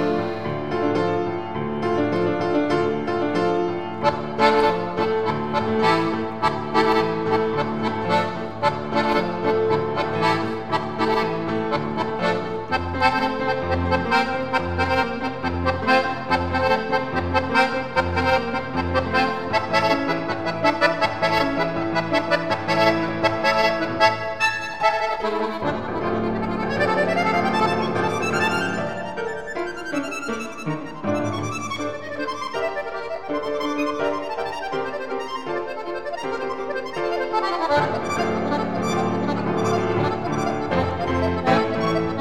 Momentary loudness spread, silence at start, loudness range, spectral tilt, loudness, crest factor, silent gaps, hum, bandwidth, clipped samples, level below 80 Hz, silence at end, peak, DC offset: 8 LU; 0 s; 6 LU; -5.5 dB/octave; -22 LUFS; 20 dB; none; none; 15.5 kHz; under 0.1%; -46 dBFS; 0 s; -2 dBFS; 1%